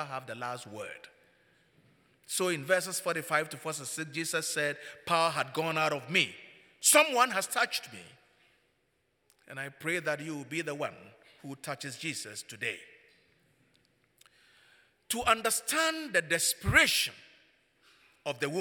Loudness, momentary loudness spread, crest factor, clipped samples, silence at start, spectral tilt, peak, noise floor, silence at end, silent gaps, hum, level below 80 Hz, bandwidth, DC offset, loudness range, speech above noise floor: -30 LUFS; 18 LU; 26 dB; under 0.1%; 0 s; -2 dB/octave; -8 dBFS; -75 dBFS; 0 s; none; none; -60 dBFS; 19 kHz; under 0.1%; 12 LU; 44 dB